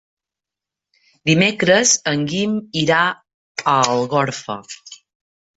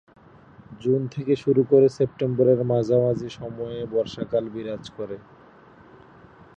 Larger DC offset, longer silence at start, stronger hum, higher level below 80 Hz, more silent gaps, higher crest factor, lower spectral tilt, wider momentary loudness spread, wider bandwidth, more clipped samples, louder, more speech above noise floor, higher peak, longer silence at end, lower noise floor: neither; first, 1.25 s vs 0.7 s; neither; about the same, -58 dBFS vs -58 dBFS; first, 3.34-3.55 s vs none; about the same, 18 dB vs 18 dB; second, -3.5 dB/octave vs -8.5 dB/octave; about the same, 17 LU vs 16 LU; about the same, 8.2 kHz vs 8 kHz; neither; first, -17 LUFS vs -23 LUFS; first, 69 dB vs 28 dB; first, -2 dBFS vs -6 dBFS; second, 0.6 s vs 1.4 s; first, -87 dBFS vs -50 dBFS